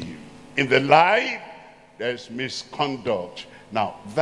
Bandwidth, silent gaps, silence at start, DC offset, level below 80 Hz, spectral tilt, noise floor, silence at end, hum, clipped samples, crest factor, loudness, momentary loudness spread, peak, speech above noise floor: 11.5 kHz; none; 0 s; under 0.1%; -62 dBFS; -4.5 dB/octave; -45 dBFS; 0 s; none; under 0.1%; 24 dB; -22 LUFS; 21 LU; 0 dBFS; 23 dB